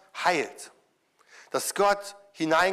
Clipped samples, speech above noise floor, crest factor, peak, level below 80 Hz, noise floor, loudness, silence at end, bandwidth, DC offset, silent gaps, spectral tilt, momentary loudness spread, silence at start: under 0.1%; 40 dB; 18 dB; -10 dBFS; -66 dBFS; -66 dBFS; -27 LUFS; 0 s; 16 kHz; under 0.1%; none; -2.5 dB/octave; 19 LU; 0.15 s